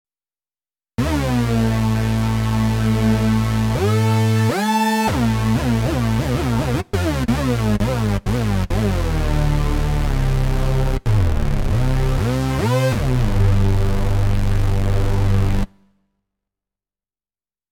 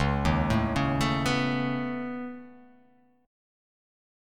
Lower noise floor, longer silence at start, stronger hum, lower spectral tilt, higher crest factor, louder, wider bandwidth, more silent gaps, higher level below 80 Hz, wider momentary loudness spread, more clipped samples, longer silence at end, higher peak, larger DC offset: first, under -90 dBFS vs -62 dBFS; first, 1 s vs 0 s; neither; about the same, -6.5 dB/octave vs -6 dB/octave; second, 12 dB vs 18 dB; first, -19 LUFS vs -28 LUFS; about the same, 17 kHz vs 15.5 kHz; neither; first, -24 dBFS vs -40 dBFS; second, 4 LU vs 12 LU; neither; first, 2.05 s vs 1 s; first, -6 dBFS vs -12 dBFS; neither